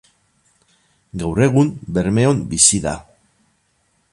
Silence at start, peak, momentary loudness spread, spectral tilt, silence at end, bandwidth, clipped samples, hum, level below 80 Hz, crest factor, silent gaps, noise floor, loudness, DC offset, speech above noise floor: 1.15 s; 0 dBFS; 14 LU; -4.5 dB/octave; 1.1 s; 11.5 kHz; under 0.1%; none; -42 dBFS; 20 dB; none; -64 dBFS; -16 LUFS; under 0.1%; 47 dB